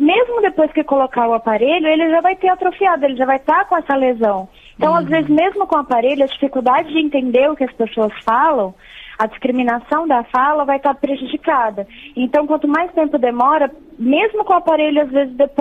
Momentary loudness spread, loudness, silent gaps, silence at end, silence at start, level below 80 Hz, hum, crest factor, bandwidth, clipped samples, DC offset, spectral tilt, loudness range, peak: 6 LU; -16 LUFS; none; 0 s; 0 s; -50 dBFS; none; 12 dB; 5 kHz; under 0.1%; under 0.1%; -7 dB/octave; 2 LU; -2 dBFS